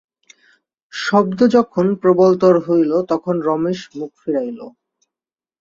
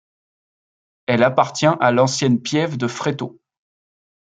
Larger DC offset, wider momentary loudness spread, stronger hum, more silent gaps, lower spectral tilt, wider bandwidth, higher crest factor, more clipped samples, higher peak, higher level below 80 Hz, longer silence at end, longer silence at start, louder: neither; first, 15 LU vs 11 LU; neither; neither; first, -7 dB/octave vs -5 dB/octave; second, 7.6 kHz vs 9.4 kHz; about the same, 18 dB vs 18 dB; neither; about the same, 0 dBFS vs -2 dBFS; about the same, -60 dBFS vs -64 dBFS; about the same, 0.9 s vs 0.9 s; second, 0.95 s vs 1.1 s; about the same, -16 LUFS vs -18 LUFS